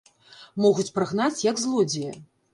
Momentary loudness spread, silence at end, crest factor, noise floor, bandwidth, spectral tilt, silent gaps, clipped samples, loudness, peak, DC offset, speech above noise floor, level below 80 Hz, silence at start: 14 LU; 0.3 s; 16 dB; -51 dBFS; 11.5 kHz; -4.5 dB/octave; none; under 0.1%; -24 LUFS; -8 dBFS; under 0.1%; 27 dB; -68 dBFS; 0.4 s